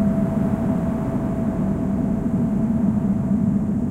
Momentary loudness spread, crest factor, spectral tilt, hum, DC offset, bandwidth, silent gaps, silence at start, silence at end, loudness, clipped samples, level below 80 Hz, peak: 3 LU; 12 dB; -10 dB/octave; none; under 0.1%; 9.2 kHz; none; 0 s; 0 s; -22 LUFS; under 0.1%; -36 dBFS; -8 dBFS